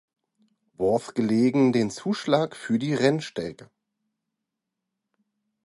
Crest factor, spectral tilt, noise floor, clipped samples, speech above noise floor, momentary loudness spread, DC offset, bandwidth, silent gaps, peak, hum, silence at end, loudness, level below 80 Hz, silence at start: 20 dB; -6 dB/octave; -84 dBFS; under 0.1%; 60 dB; 9 LU; under 0.1%; 11.5 kHz; none; -8 dBFS; none; 2 s; -24 LUFS; -64 dBFS; 0.8 s